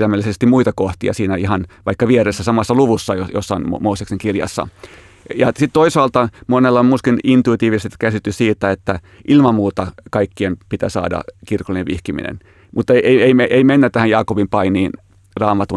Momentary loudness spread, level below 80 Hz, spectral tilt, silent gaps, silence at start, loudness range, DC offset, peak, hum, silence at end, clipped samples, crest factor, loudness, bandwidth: 12 LU; -46 dBFS; -6.5 dB/octave; none; 0 s; 4 LU; under 0.1%; 0 dBFS; none; 0 s; under 0.1%; 14 dB; -16 LUFS; 12 kHz